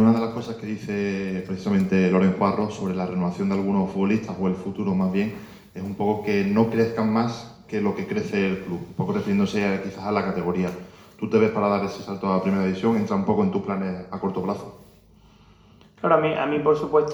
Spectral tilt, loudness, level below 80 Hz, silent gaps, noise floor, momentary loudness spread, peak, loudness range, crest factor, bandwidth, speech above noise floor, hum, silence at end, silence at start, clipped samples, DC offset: -7.5 dB/octave; -24 LUFS; -58 dBFS; none; -53 dBFS; 10 LU; -4 dBFS; 3 LU; 18 dB; 20 kHz; 30 dB; none; 0 s; 0 s; under 0.1%; under 0.1%